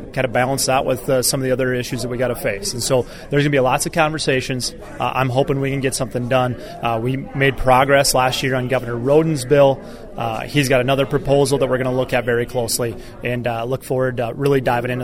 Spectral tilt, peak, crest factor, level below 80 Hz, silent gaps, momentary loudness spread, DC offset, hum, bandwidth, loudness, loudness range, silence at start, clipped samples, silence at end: -4.5 dB/octave; 0 dBFS; 18 dB; -38 dBFS; none; 9 LU; under 0.1%; none; 16.5 kHz; -18 LUFS; 4 LU; 0 s; under 0.1%; 0 s